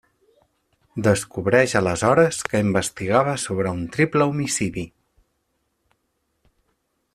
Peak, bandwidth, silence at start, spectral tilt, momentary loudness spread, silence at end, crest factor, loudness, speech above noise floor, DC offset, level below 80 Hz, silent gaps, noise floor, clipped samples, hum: -2 dBFS; 14.5 kHz; 0.95 s; -5 dB/octave; 8 LU; 2.25 s; 20 dB; -21 LUFS; 52 dB; under 0.1%; -54 dBFS; none; -72 dBFS; under 0.1%; none